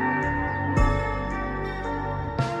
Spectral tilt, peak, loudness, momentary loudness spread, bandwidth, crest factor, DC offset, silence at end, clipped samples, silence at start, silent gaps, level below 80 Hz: -7 dB/octave; -8 dBFS; -27 LUFS; 6 LU; 9.6 kHz; 16 dB; under 0.1%; 0 s; under 0.1%; 0 s; none; -32 dBFS